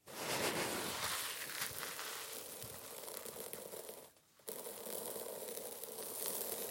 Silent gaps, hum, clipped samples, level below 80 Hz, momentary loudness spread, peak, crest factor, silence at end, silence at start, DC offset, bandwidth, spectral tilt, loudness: none; none; under 0.1%; -78 dBFS; 10 LU; -18 dBFS; 26 dB; 0 s; 0.05 s; under 0.1%; 17 kHz; -1.5 dB/octave; -42 LUFS